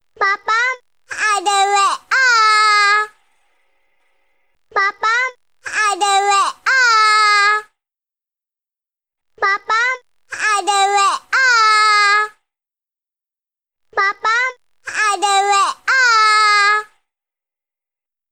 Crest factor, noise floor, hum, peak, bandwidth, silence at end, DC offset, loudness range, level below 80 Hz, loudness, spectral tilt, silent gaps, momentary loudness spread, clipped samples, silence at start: 14 dB; -90 dBFS; none; -2 dBFS; 16.5 kHz; 1.45 s; 0.1%; 5 LU; -70 dBFS; -14 LUFS; 2.5 dB/octave; none; 12 LU; under 0.1%; 0.2 s